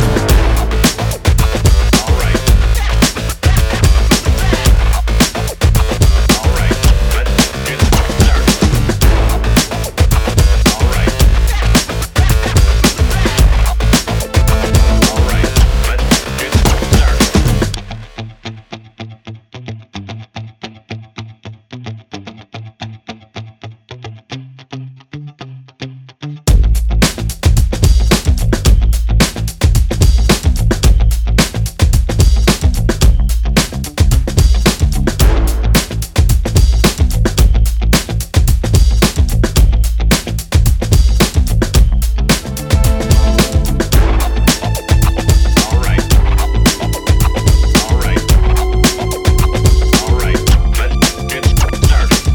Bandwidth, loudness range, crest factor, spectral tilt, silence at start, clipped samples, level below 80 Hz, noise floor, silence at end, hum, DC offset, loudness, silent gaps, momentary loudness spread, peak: over 20 kHz; 17 LU; 10 dB; -4.5 dB/octave; 0 s; under 0.1%; -14 dBFS; -33 dBFS; 0 s; none; under 0.1%; -13 LUFS; none; 18 LU; 0 dBFS